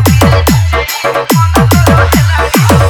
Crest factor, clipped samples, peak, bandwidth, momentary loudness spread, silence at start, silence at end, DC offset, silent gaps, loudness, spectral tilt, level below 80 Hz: 8 dB; 1%; 0 dBFS; over 20 kHz; 5 LU; 0 s; 0 s; under 0.1%; none; -8 LUFS; -5.5 dB/octave; -18 dBFS